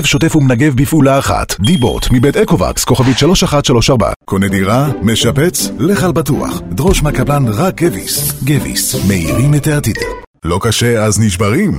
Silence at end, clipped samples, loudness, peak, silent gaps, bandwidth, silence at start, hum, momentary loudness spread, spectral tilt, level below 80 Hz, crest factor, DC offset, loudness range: 0 s; under 0.1%; -12 LUFS; 0 dBFS; 4.16-4.20 s, 10.27-10.34 s; 16.5 kHz; 0 s; none; 5 LU; -5 dB/octave; -26 dBFS; 12 dB; under 0.1%; 2 LU